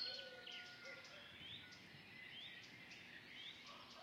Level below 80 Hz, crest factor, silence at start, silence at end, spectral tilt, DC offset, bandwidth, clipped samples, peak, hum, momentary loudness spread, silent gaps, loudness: -84 dBFS; 20 dB; 0 s; 0 s; -2.5 dB/octave; under 0.1%; 15.5 kHz; under 0.1%; -36 dBFS; none; 4 LU; none; -54 LUFS